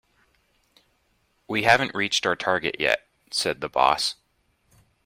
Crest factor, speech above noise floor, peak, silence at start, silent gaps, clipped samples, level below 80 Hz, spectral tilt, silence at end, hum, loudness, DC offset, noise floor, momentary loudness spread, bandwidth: 24 dB; 45 dB; -4 dBFS; 1.5 s; none; under 0.1%; -60 dBFS; -2.5 dB/octave; 0.95 s; none; -23 LUFS; under 0.1%; -68 dBFS; 8 LU; 16 kHz